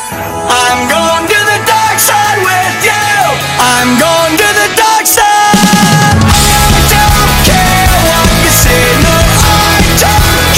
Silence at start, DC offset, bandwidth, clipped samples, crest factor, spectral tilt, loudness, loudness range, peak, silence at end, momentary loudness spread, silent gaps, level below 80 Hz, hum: 0 s; under 0.1%; over 20 kHz; 0.9%; 8 dB; -3 dB/octave; -6 LUFS; 2 LU; 0 dBFS; 0 s; 3 LU; none; -18 dBFS; none